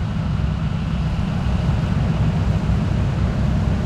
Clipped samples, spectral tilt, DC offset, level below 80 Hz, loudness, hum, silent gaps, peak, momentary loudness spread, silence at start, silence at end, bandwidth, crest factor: under 0.1%; -8 dB/octave; under 0.1%; -26 dBFS; -21 LUFS; none; none; -6 dBFS; 3 LU; 0 s; 0 s; 9.4 kHz; 14 dB